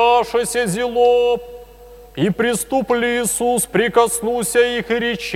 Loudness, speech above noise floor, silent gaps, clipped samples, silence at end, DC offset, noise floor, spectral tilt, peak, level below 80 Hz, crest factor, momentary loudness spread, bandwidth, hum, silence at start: -17 LUFS; 24 dB; none; under 0.1%; 0 s; under 0.1%; -41 dBFS; -3.5 dB/octave; 0 dBFS; -46 dBFS; 16 dB; 6 LU; 16 kHz; none; 0 s